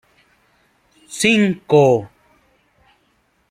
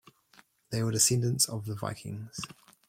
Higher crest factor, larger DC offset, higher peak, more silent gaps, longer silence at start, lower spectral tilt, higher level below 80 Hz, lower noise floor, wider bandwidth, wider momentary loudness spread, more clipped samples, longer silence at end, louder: about the same, 18 dB vs 22 dB; neither; first, -2 dBFS vs -10 dBFS; neither; first, 1.1 s vs 0.7 s; first, -5 dB/octave vs -3.5 dB/octave; about the same, -60 dBFS vs -64 dBFS; about the same, -62 dBFS vs -62 dBFS; about the same, 15.5 kHz vs 16.5 kHz; second, 7 LU vs 16 LU; neither; first, 1.45 s vs 0.35 s; first, -15 LUFS vs -29 LUFS